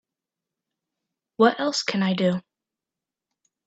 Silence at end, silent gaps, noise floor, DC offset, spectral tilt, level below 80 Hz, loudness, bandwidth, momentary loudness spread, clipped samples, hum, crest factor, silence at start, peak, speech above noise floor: 1.25 s; none; -88 dBFS; under 0.1%; -5 dB/octave; -72 dBFS; -23 LUFS; 8 kHz; 5 LU; under 0.1%; none; 22 dB; 1.4 s; -4 dBFS; 67 dB